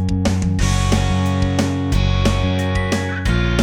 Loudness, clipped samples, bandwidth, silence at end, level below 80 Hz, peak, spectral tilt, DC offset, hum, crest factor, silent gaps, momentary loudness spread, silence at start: -18 LUFS; under 0.1%; 13.5 kHz; 0 s; -24 dBFS; -2 dBFS; -5.5 dB/octave; under 0.1%; none; 14 dB; none; 2 LU; 0 s